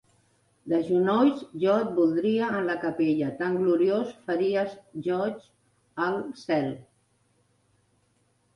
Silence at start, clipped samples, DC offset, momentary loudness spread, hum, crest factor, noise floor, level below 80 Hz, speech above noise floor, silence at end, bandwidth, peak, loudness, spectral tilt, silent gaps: 0.65 s; under 0.1%; under 0.1%; 10 LU; none; 16 dB; -69 dBFS; -70 dBFS; 43 dB; 1.75 s; 11 kHz; -12 dBFS; -26 LUFS; -7.5 dB/octave; none